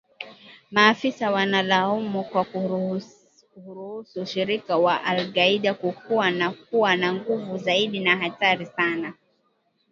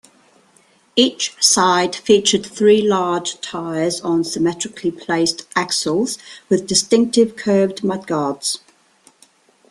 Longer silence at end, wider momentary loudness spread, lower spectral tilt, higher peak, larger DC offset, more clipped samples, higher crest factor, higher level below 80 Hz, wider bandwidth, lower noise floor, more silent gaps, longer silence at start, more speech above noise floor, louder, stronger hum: second, 0.8 s vs 1.15 s; first, 14 LU vs 9 LU; first, -5 dB/octave vs -3 dB/octave; about the same, 0 dBFS vs 0 dBFS; neither; neither; first, 24 dB vs 18 dB; second, -72 dBFS vs -60 dBFS; second, 7.4 kHz vs 13 kHz; first, -69 dBFS vs -55 dBFS; neither; second, 0.2 s vs 0.95 s; first, 45 dB vs 37 dB; second, -23 LUFS vs -17 LUFS; neither